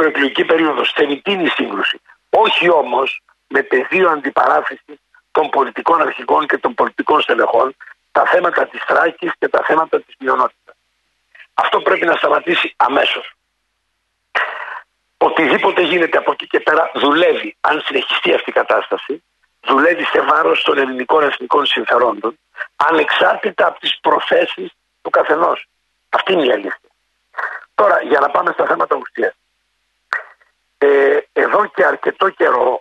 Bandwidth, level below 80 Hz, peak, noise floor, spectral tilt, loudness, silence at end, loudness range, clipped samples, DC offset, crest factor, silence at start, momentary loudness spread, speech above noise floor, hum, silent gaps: 9.8 kHz; -64 dBFS; -2 dBFS; -69 dBFS; -5 dB/octave; -15 LUFS; 0 s; 3 LU; under 0.1%; under 0.1%; 14 dB; 0 s; 11 LU; 54 dB; none; none